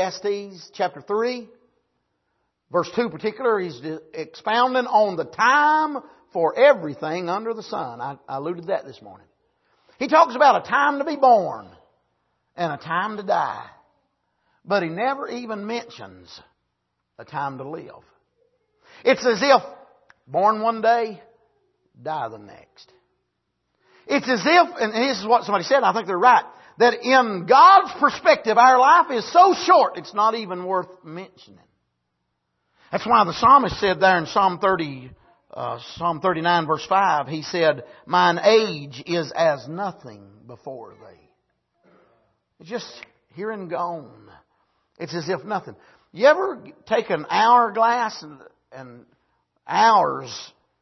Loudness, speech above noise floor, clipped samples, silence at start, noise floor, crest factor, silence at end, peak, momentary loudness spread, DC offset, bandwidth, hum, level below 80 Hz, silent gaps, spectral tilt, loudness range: -20 LUFS; 56 dB; under 0.1%; 0 s; -76 dBFS; 20 dB; 0.35 s; -2 dBFS; 18 LU; under 0.1%; 6.2 kHz; none; -62 dBFS; none; -4.5 dB/octave; 15 LU